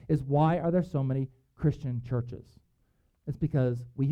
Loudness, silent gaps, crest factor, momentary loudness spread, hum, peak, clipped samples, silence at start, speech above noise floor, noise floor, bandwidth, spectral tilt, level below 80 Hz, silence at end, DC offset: -30 LUFS; none; 16 dB; 15 LU; none; -12 dBFS; under 0.1%; 0.05 s; 42 dB; -70 dBFS; 5.8 kHz; -10 dB/octave; -52 dBFS; 0 s; under 0.1%